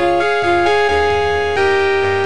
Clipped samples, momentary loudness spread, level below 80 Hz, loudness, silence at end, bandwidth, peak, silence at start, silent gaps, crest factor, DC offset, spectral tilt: under 0.1%; 2 LU; -36 dBFS; -14 LUFS; 0 s; 10 kHz; -6 dBFS; 0 s; none; 10 dB; 3%; -5 dB/octave